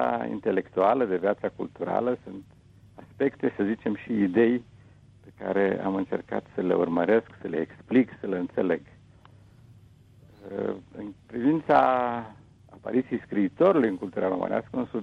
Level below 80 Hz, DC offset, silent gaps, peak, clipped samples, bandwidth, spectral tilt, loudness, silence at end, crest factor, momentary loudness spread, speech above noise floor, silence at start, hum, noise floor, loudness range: -62 dBFS; under 0.1%; none; -8 dBFS; under 0.1%; 6.4 kHz; -9 dB/octave; -27 LUFS; 0 s; 18 dB; 13 LU; 28 dB; 0 s; none; -54 dBFS; 5 LU